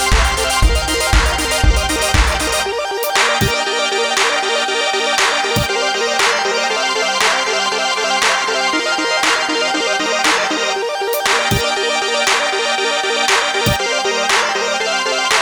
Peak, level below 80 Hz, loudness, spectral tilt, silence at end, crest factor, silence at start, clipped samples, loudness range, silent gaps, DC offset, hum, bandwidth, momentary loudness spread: 0 dBFS; -24 dBFS; -15 LUFS; -2 dB/octave; 0 s; 14 dB; 0 s; under 0.1%; 0 LU; none; under 0.1%; none; over 20 kHz; 2 LU